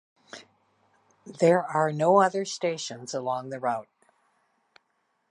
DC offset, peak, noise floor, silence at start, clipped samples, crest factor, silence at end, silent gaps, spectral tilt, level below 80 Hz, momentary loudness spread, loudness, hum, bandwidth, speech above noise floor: under 0.1%; -8 dBFS; -74 dBFS; 0.35 s; under 0.1%; 22 dB; 1.5 s; none; -5 dB/octave; -82 dBFS; 25 LU; -26 LUFS; none; 11 kHz; 49 dB